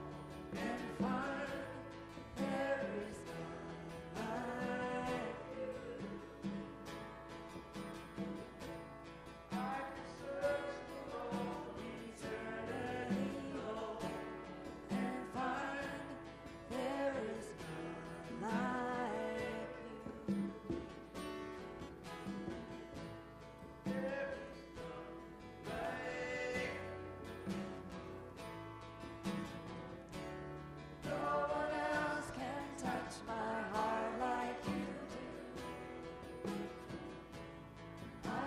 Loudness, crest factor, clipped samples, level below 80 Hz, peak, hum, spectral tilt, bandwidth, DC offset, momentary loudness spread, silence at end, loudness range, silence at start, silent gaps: -44 LUFS; 18 dB; under 0.1%; -64 dBFS; -26 dBFS; none; -5.5 dB/octave; 15 kHz; under 0.1%; 12 LU; 0 s; 6 LU; 0 s; none